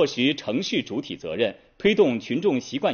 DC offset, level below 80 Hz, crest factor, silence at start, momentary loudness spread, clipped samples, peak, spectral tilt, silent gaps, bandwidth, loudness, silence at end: under 0.1%; -60 dBFS; 16 dB; 0 s; 9 LU; under 0.1%; -8 dBFS; -3.5 dB/octave; none; 6.8 kHz; -24 LUFS; 0 s